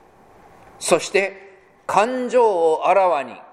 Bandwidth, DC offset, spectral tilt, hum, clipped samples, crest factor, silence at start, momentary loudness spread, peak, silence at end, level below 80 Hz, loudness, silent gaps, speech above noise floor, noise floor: 14.5 kHz; under 0.1%; -3 dB/octave; none; under 0.1%; 20 dB; 0.8 s; 9 LU; 0 dBFS; 0.1 s; -64 dBFS; -19 LUFS; none; 31 dB; -49 dBFS